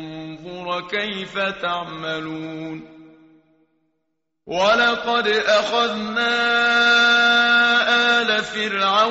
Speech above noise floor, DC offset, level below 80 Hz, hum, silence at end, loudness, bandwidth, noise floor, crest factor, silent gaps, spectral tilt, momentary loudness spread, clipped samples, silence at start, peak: 57 dB; under 0.1%; -60 dBFS; none; 0 s; -18 LUFS; 8 kHz; -76 dBFS; 14 dB; none; 0.5 dB/octave; 17 LU; under 0.1%; 0 s; -6 dBFS